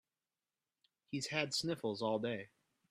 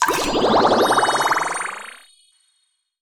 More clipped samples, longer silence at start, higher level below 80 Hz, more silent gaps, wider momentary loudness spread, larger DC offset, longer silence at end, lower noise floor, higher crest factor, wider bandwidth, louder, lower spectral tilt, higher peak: neither; first, 1.1 s vs 0 s; second, -80 dBFS vs -48 dBFS; neither; second, 10 LU vs 14 LU; neither; second, 0.45 s vs 1.1 s; first, under -90 dBFS vs -68 dBFS; first, 24 dB vs 18 dB; second, 15 kHz vs over 20 kHz; second, -39 LUFS vs -18 LUFS; first, -4 dB/octave vs -2.5 dB/octave; second, -18 dBFS vs -2 dBFS